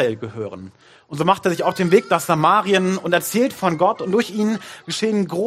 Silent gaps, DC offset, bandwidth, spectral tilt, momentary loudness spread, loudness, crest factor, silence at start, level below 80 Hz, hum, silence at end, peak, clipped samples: none; under 0.1%; 15.5 kHz; -5 dB/octave; 13 LU; -19 LUFS; 18 dB; 0 s; -64 dBFS; none; 0 s; 0 dBFS; under 0.1%